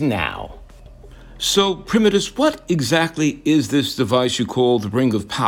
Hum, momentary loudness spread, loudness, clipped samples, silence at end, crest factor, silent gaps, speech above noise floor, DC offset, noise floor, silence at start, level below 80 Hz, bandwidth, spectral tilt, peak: none; 6 LU; -18 LUFS; under 0.1%; 0 s; 16 dB; none; 23 dB; under 0.1%; -41 dBFS; 0 s; -44 dBFS; 17.5 kHz; -4.5 dB/octave; -2 dBFS